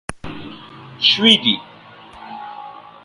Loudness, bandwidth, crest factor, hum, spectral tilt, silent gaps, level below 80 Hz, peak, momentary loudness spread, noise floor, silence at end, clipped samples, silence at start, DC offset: -14 LUFS; 11.5 kHz; 22 dB; none; -3.5 dB/octave; none; -50 dBFS; 0 dBFS; 25 LU; -42 dBFS; 0.35 s; under 0.1%; 0.1 s; under 0.1%